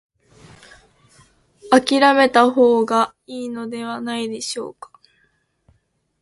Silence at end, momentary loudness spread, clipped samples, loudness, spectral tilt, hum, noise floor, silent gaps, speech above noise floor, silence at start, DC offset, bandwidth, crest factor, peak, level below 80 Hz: 1.5 s; 16 LU; under 0.1%; -18 LUFS; -3.5 dB/octave; none; -64 dBFS; none; 47 dB; 1.65 s; under 0.1%; 11.5 kHz; 20 dB; 0 dBFS; -62 dBFS